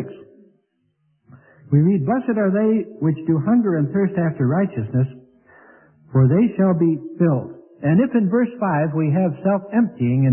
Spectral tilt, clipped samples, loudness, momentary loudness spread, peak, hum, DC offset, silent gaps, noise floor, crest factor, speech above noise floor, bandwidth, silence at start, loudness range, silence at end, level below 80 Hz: -14.5 dB/octave; under 0.1%; -19 LUFS; 6 LU; -6 dBFS; none; under 0.1%; none; -67 dBFS; 14 dB; 49 dB; 3.1 kHz; 0 s; 2 LU; 0 s; -58 dBFS